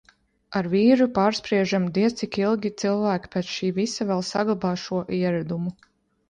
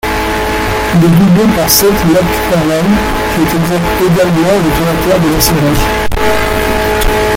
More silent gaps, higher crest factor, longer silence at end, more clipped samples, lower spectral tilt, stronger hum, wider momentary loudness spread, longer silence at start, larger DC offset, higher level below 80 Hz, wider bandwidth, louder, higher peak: neither; first, 18 dB vs 10 dB; first, 0.55 s vs 0 s; neither; about the same, -6 dB/octave vs -5 dB/octave; neither; first, 9 LU vs 6 LU; first, 0.5 s vs 0.05 s; neither; second, -60 dBFS vs -22 dBFS; second, 9.8 kHz vs 17 kHz; second, -24 LUFS vs -10 LUFS; second, -6 dBFS vs 0 dBFS